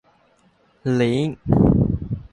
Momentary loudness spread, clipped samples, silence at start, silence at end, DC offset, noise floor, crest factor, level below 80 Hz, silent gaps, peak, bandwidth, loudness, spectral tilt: 9 LU; under 0.1%; 0.85 s; 0.05 s; under 0.1%; -59 dBFS; 18 dB; -34 dBFS; none; -2 dBFS; 10.5 kHz; -20 LUFS; -8.5 dB/octave